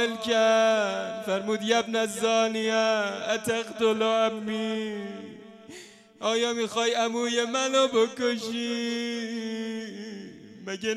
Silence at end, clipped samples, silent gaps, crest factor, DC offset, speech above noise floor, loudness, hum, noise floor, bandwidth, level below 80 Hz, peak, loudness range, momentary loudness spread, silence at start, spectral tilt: 0 s; under 0.1%; none; 16 dB; under 0.1%; 22 dB; -26 LUFS; none; -48 dBFS; 13.5 kHz; -76 dBFS; -10 dBFS; 4 LU; 17 LU; 0 s; -3 dB/octave